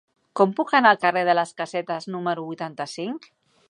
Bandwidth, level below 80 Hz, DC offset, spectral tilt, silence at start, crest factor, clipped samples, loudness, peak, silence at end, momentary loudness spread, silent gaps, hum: 11 kHz; -80 dBFS; under 0.1%; -5 dB/octave; 0.35 s; 20 dB; under 0.1%; -23 LUFS; -2 dBFS; 0.5 s; 15 LU; none; none